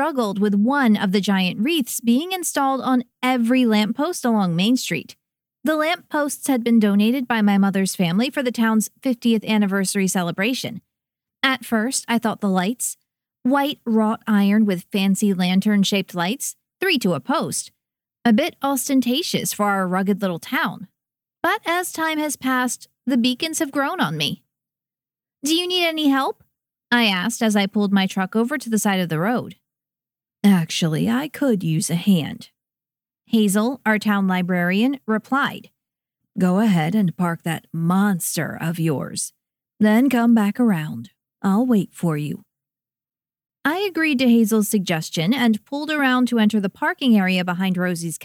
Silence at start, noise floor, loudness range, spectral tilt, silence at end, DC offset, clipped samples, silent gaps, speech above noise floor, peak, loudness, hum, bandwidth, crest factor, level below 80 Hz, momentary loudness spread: 0 s; under -90 dBFS; 3 LU; -4.5 dB/octave; 0 s; under 0.1%; under 0.1%; none; over 70 dB; -4 dBFS; -20 LUFS; none; 17 kHz; 18 dB; -70 dBFS; 8 LU